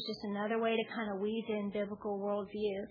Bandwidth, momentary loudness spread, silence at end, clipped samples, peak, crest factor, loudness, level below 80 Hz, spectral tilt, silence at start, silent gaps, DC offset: 5.2 kHz; 5 LU; 0 s; under 0.1%; -20 dBFS; 16 dB; -37 LUFS; -72 dBFS; -4 dB/octave; 0 s; none; under 0.1%